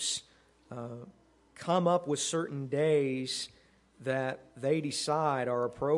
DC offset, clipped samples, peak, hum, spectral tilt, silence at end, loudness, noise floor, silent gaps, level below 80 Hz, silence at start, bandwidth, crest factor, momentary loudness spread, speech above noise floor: under 0.1%; under 0.1%; -14 dBFS; none; -4.5 dB/octave; 0 s; -32 LUFS; -63 dBFS; none; -70 dBFS; 0 s; 11.5 kHz; 18 dB; 15 LU; 32 dB